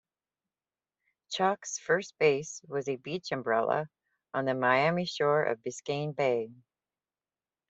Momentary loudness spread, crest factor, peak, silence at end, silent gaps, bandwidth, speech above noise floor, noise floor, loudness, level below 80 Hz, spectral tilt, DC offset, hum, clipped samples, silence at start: 10 LU; 20 dB; -12 dBFS; 1.15 s; none; 8.2 kHz; over 60 dB; under -90 dBFS; -30 LUFS; -76 dBFS; -4.5 dB/octave; under 0.1%; none; under 0.1%; 1.3 s